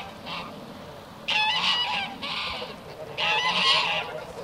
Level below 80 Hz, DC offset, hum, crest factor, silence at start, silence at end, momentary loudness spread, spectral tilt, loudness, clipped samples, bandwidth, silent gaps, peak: -60 dBFS; under 0.1%; none; 20 dB; 0 s; 0 s; 19 LU; -2 dB/octave; -24 LUFS; under 0.1%; 16 kHz; none; -8 dBFS